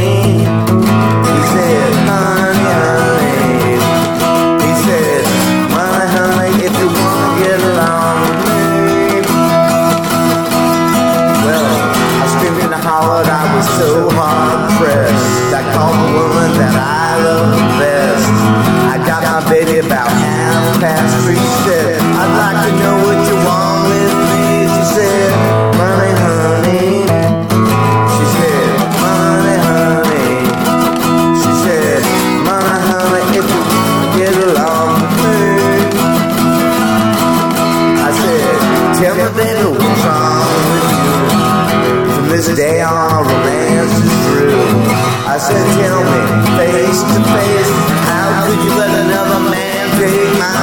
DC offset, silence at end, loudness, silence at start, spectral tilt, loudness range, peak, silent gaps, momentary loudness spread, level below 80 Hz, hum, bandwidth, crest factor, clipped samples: under 0.1%; 0 s; -11 LUFS; 0 s; -5 dB/octave; 1 LU; 0 dBFS; none; 2 LU; -40 dBFS; none; 19 kHz; 10 dB; under 0.1%